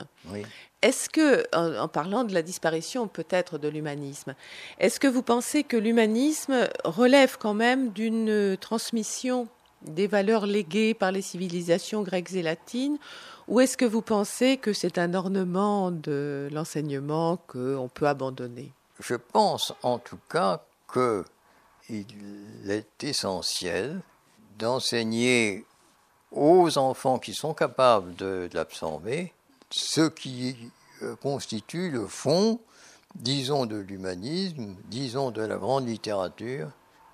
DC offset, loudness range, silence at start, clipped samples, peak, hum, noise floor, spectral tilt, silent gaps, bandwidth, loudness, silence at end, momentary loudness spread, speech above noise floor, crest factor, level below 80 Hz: under 0.1%; 7 LU; 0 s; under 0.1%; -6 dBFS; none; -62 dBFS; -4.5 dB/octave; none; 15 kHz; -27 LUFS; 0.4 s; 15 LU; 36 dB; 22 dB; -70 dBFS